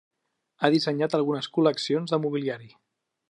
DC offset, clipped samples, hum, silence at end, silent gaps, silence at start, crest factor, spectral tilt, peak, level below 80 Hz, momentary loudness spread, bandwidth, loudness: under 0.1%; under 0.1%; none; 0.6 s; none; 0.6 s; 22 dB; -6 dB/octave; -4 dBFS; -80 dBFS; 7 LU; 11 kHz; -25 LUFS